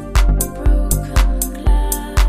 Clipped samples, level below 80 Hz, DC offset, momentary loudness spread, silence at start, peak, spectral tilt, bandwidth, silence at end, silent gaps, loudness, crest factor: under 0.1%; -16 dBFS; under 0.1%; 2 LU; 0 s; -2 dBFS; -4.5 dB/octave; 15.5 kHz; 0 s; none; -18 LUFS; 14 dB